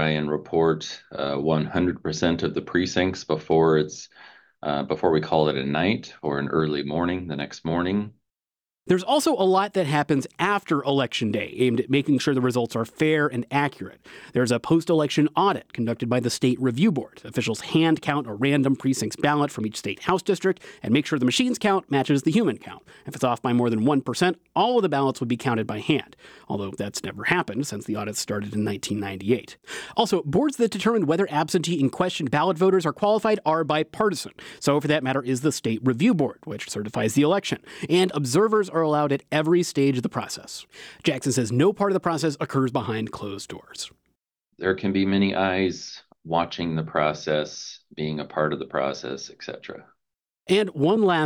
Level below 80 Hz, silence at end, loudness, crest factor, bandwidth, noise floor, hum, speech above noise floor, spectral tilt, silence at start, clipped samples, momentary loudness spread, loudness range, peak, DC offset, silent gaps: -60 dBFS; 0 s; -24 LUFS; 20 dB; 18 kHz; under -90 dBFS; none; over 67 dB; -5.5 dB/octave; 0 s; under 0.1%; 11 LU; 4 LU; -4 dBFS; under 0.1%; none